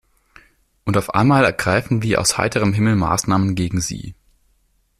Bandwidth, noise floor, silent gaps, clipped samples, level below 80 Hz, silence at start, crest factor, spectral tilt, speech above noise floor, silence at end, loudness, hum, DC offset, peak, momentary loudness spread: 14.5 kHz; -62 dBFS; none; under 0.1%; -44 dBFS; 0.85 s; 16 dB; -5 dB/octave; 44 dB; 0.85 s; -18 LUFS; none; under 0.1%; -2 dBFS; 10 LU